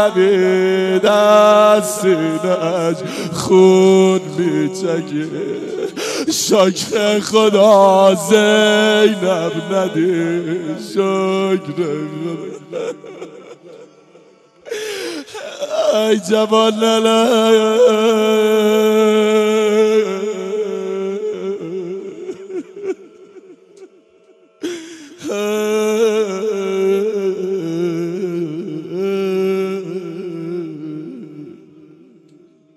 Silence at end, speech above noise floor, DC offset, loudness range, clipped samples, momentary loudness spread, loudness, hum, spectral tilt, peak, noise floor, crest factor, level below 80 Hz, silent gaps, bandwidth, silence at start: 1.2 s; 37 dB; under 0.1%; 14 LU; under 0.1%; 17 LU; -15 LUFS; none; -4.5 dB/octave; 0 dBFS; -50 dBFS; 16 dB; -66 dBFS; none; 15 kHz; 0 s